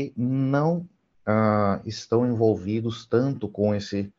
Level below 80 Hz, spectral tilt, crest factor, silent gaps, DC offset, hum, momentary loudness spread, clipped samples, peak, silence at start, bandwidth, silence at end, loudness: -60 dBFS; -7.5 dB/octave; 18 dB; none; under 0.1%; none; 7 LU; under 0.1%; -8 dBFS; 0 s; 7.6 kHz; 0.1 s; -25 LUFS